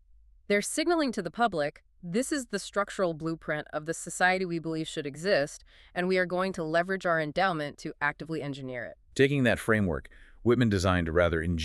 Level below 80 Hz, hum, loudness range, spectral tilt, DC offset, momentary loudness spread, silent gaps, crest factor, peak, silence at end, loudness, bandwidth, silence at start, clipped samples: -50 dBFS; none; 3 LU; -5 dB/octave; under 0.1%; 10 LU; none; 20 dB; -10 dBFS; 0 s; -29 LUFS; 13.5 kHz; 0.5 s; under 0.1%